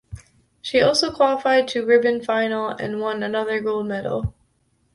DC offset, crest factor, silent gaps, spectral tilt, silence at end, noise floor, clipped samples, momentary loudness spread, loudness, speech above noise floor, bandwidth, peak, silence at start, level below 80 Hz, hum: under 0.1%; 18 dB; none; -4.5 dB/octave; 0.65 s; -65 dBFS; under 0.1%; 9 LU; -21 LUFS; 45 dB; 11.5 kHz; -4 dBFS; 0.1 s; -46 dBFS; none